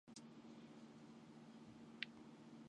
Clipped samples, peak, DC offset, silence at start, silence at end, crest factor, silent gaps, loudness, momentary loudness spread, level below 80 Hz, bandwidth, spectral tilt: under 0.1%; -24 dBFS; under 0.1%; 0.05 s; 0 s; 34 dB; none; -58 LUFS; 9 LU; -88 dBFS; 10.5 kHz; -4 dB/octave